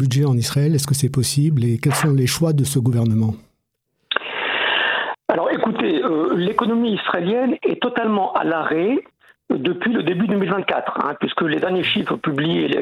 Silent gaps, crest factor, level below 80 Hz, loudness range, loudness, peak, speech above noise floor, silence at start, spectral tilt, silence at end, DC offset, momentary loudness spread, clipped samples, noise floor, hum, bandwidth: none; 20 dB; -56 dBFS; 2 LU; -19 LUFS; 0 dBFS; 54 dB; 0 s; -5.5 dB/octave; 0 s; under 0.1%; 4 LU; under 0.1%; -72 dBFS; none; 16 kHz